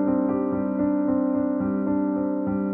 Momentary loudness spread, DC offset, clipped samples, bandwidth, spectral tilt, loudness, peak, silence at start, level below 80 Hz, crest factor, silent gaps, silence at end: 2 LU; under 0.1%; under 0.1%; 2.5 kHz; -13 dB/octave; -24 LUFS; -12 dBFS; 0 s; -54 dBFS; 10 dB; none; 0 s